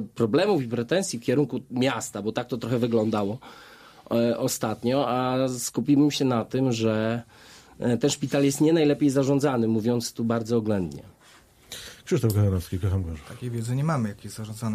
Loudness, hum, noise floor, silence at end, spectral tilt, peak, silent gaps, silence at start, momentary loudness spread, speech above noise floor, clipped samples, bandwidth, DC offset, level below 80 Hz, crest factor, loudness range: -25 LUFS; none; -55 dBFS; 0 s; -6 dB/octave; -10 dBFS; none; 0 s; 12 LU; 30 dB; under 0.1%; 15.5 kHz; under 0.1%; -54 dBFS; 16 dB; 4 LU